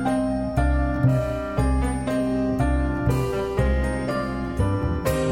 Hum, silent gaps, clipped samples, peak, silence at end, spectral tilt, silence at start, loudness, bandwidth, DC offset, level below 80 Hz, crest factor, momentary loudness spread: none; none; under 0.1%; -8 dBFS; 0 s; -7.5 dB/octave; 0 s; -24 LUFS; 16 kHz; 0.3%; -28 dBFS; 14 dB; 4 LU